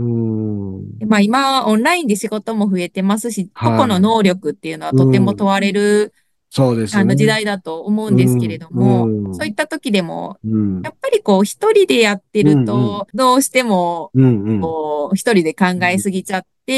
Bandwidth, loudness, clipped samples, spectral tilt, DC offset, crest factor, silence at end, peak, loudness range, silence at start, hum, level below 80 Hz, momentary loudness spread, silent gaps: 12.5 kHz; -16 LUFS; under 0.1%; -6 dB/octave; under 0.1%; 14 dB; 0 s; 0 dBFS; 3 LU; 0 s; none; -56 dBFS; 9 LU; none